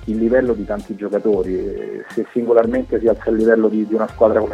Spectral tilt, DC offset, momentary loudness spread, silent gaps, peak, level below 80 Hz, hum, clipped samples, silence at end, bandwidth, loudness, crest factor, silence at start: -8.5 dB/octave; under 0.1%; 10 LU; none; 0 dBFS; -40 dBFS; none; under 0.1%; 0 s; 9.8 kHz; -18 LUFS; 16 dB; 0 s